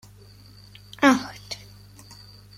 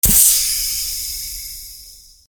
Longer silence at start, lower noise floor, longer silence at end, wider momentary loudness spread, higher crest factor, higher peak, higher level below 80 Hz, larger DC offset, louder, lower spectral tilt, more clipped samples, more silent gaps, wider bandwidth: first, 1 s vs 0.05 s; first, -49 dBFS vs -42 dBFS; first, 1.05 s vs 0.3 s; first, 26 LU vs 21 LU; first, 26 dB vs 18 dB; about the same, -2 dBFS vs 0 dBFS; second, -56 dBFS vs -34 dBFS; neither; second, -21 LUFS vs -15 LUFS; first, -4 dB/octave vs 0 dB/octave; neither; neither; second, 15.5 kHz vs over 20 kHz